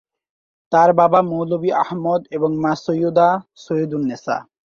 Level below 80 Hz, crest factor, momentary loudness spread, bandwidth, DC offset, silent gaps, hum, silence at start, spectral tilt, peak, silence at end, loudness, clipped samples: -62 dBFS; 18 dB; 11 LU; 7.2 kHz; under 0.1%; none; none; 0.7 s; -7.5 dB/octave; -2 dBFS; 0.35 s; -18 LUFS; under 0.1%